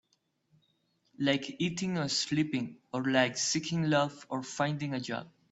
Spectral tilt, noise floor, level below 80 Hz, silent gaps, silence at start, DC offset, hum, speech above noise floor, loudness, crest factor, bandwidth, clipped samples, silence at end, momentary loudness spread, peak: -4 dB/octave; -76 dBFS; -70 dBFS; none; 1.2 s; under 0.1%; none; 44 dB; -31 LUFS; 20 dB; 8.4 kHz; under 0.1%; 0.2 s; 10 LU; -12 dBFS